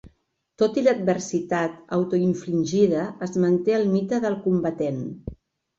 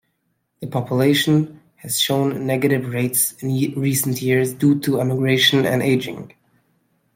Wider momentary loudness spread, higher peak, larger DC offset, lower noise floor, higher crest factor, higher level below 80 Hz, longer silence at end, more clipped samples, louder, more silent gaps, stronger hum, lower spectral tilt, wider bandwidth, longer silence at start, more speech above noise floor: second, 7 LU vs 11 LU; second, -8 dBFS vs -2 dBFS; neither; second, -64 dBFS vs -70 dBFS; about the same, 16 dB vs 18 dB; first, -54 dBFS vs -60 dBFS; second, 0.45 s vs 0.9 s; neither; second, -23 LUFS vs -19 LUFS; neither; neither; first, -7 dB/octave vs -4.5 dB/octave; second, 7.8 kHz vs 16.5 kHz; second, 0.05 s vs 0.6 s; second, 41 dB vs 52 dB